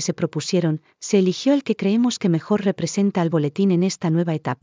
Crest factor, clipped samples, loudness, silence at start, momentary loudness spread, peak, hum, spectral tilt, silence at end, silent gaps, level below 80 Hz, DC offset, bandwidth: 16 dB; under 0.1%; -21 LUFS; 0 s; 4 LU; -6 dBFS; none; -6 dB/octave; 0.1 s; none; -68 dBFS; under 0.1%; 7.6 kHz